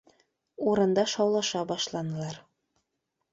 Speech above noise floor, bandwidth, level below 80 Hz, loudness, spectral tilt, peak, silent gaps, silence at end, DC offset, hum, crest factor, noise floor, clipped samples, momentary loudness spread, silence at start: 54 dB; 8 kHz; -70 dBFS; -28 LUFS; -4.5 dB/octave; -12 dBFS; none; 0.95 s; under 0.1%; none; 18 dB; -82 dBFS; under 0.1%; 12 LU; 0.6 s